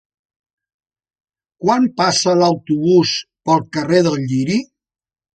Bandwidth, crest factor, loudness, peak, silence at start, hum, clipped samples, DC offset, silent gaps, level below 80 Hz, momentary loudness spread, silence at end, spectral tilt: 9.2 kHz; 16 dB; -16 LUFS; -2 dBFS; 1.6 s; none; under 0.1%; under 0.1%; none; -58 dBFS; 6 LU; 0.75 s; -5 dB/octave